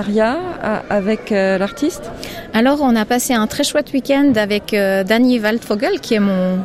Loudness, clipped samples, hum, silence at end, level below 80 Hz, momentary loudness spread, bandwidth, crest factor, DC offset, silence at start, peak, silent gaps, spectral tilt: -16 LUFS; under 0.1%; none; 0 s; -44 dBFS; 8 LU; 16 kHz; 14 dB; under 0.1%; 0 s; -2 dBFS; none; -5 dB/octave